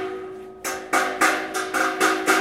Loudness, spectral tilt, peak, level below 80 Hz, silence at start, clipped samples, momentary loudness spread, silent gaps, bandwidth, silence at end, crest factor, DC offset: -22 LUFS; -1.5 dB/octave; -4 dBFS; -62 dBFS; 0 s; under 0.1%; 12 LU; none; 16.5 kHz; 0 s; 20 dB; under 0.1%